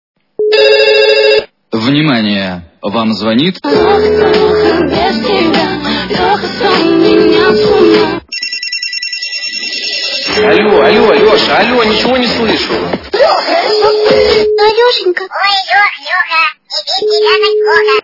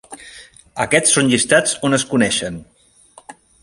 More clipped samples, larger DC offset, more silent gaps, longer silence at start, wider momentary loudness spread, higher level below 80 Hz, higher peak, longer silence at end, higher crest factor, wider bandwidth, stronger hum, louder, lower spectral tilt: first, 0.7% vs under 0.1%; neither; neither; first, 0.4 s vs 0.1 s; second, 7 LU vs 22 LU; first, -40 dBFS vs -52 dBFS; about the same, 0 dBFS vs 0 dBFS; second, 0 s vs 0.3 s; second, 10 dB vs 18 dB; second, 6 kHz vs 11.5 kHz; neither; first, -9 LUFS vs -15 LUFS; first, -4.5 dB/octave vs -3 dB/octave